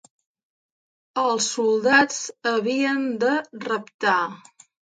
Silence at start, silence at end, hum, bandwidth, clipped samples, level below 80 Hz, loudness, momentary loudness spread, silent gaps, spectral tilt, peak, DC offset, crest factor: 1.15 s; 0.6 s; none; 9.6 kHz; under 0.1%; -72 dBFS; -22 LUFS; 11 LU; 3.94-3.99 s; -2.5 dB/octave; -4 dBFS; under 0.1%; 20 dB